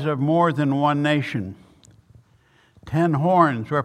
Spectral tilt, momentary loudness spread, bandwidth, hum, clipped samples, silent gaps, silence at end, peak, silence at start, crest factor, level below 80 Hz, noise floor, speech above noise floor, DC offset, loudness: -8 dB/octave; 10 LU; 10 kHz; none; under 0.1%; none; 0 s; -2 dBFS; 0 s; 20 dB; -58 dBFS; -58 dBFS; 38 dB; under 0.1%; -20 LUFS